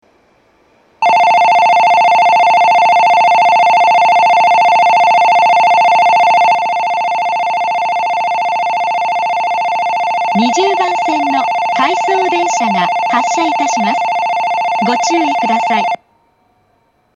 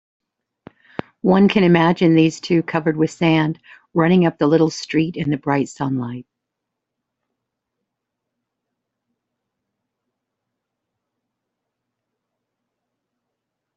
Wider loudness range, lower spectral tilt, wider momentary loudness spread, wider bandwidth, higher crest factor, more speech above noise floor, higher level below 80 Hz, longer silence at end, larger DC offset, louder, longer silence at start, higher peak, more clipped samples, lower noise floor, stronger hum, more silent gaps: second, 6 LU vs 11 LU; second, -3 dB/octave vs -7 dB/octave; second, 6 LU vs 14 LU; first, 9.8 kHz vs 8 kHz; second, 12 dB vs 20 dB; second, 44 dB vs 64 dB; second, -66 dBFS vs -58 dBFS; second, 1.2 s vs 7.55 s; neither; first, -11 LUFS vs -17 LUFS; second, 1 s vs 1.25 s; about the same, 0 dBFS vs -2 dBFS; neither; second, -57 dBFS vs -81 dBFS; neither; neither